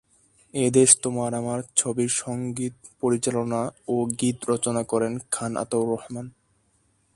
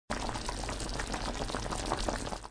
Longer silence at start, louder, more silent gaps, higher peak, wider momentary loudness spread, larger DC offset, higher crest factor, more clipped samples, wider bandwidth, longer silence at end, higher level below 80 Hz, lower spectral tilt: first, 0.55 s vs 0.1 s; first, -24 LUFS vs -36 LUFS; neither; first, 0 dBFS vs -16 dBFS; first, 13 LU vs 3 LU; neither; about the same, 24 dB vs 20 dB; neither; about the same, 11.5 kHz vs 10.5 kHz; first, 0.85 s vs 0 s; second, -62 dBFS vs -42 dBFS; about the same, -4 dB/octave vs -3.5 dB/octave